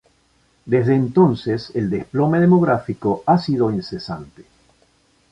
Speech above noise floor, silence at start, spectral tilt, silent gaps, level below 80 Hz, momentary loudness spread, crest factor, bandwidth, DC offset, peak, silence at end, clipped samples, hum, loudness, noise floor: 42 dB; 0.65 s; -9 dB/octave; none; -52 dBFS; 13 LU; 16 dB; 7.6 kHz; under 0.1%; -2 dBFS; 0.9 s; under 0.1%; none; -18 LUFS; -60 dBFS